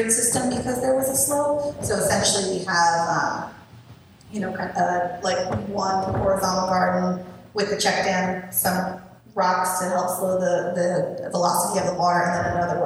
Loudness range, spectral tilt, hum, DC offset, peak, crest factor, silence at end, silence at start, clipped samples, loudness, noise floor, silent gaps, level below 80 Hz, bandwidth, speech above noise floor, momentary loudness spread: 3 LU; -3.5 dB/octave; none; under 0.1%; -6 dBFS; 18 dB; 0 s; 0 s; under 0.1%; -22 LUFS; -47 dBFS; none; -52 dBFS; 16.5 kHz; 25 dB; 8 LU